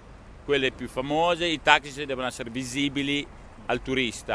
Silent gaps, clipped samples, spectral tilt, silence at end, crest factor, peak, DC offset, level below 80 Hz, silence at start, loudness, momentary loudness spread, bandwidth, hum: none; under 0.1%; -3.5 dB/octave; 0 s; 26 dB; 0 dBFS; under 0.1%; -48 dBFS; 0 s; -26 LUFS; 12 LU; 11 kHz; none